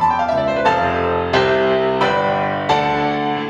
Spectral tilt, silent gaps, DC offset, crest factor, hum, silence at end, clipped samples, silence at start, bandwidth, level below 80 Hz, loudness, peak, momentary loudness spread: -6 dB/octave; none; under 0.1%; 14 dB; none; 0 s; under 0.1%; 0 s; 10 kHz; -44 dBFS; -17 LUFS; -2 dBFS; 3 LU